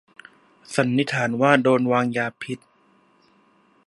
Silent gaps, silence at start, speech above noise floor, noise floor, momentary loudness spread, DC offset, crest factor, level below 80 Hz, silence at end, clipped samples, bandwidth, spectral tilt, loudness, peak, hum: none; 0.7 s; 39 dB; -60 dBFS; 15 LU; under 0.1%; 22 dB; -70 dBFS; 1.3 s; under 0.1%; 11.5 kHz; -6 dB/octave; -21 LUFS; 0 dBFS; none